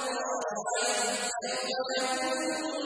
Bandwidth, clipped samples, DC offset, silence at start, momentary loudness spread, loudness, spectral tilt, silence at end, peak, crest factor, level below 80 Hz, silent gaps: 10.5 kHz; under 0.1%; under 0.1%; 0 s; 4 LU; -30 LUFS; -0.5 dB/octave; 0 s; -18 dBFS; 14 dB; -78 dBFS; none